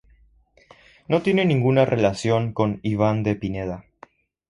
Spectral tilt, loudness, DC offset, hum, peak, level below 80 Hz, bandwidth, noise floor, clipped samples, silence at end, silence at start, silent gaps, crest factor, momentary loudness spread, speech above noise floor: -7 dB/octave; -22 LUFS; under 0.1%; none; -4 dBFS; -50 dBFS; 11 kHz; -57 dBFS; under 0.1%; 0.7 s; 1.1 s; none; 18 dB; 10 LU; 36 dB